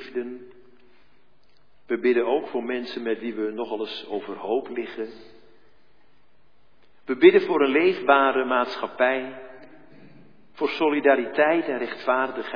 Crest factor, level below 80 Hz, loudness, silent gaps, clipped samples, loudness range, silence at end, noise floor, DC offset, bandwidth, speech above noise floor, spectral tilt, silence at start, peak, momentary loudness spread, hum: 22 dB; -72 dBFS; -23 LUFS; none; under 0.1%; 11 LU; 0 s; -65 dBFS; 0.4%; 5.2 kHz; 42 dB; -6.5 dB/octave; 0 s; -2 dBFS; 14 LU; none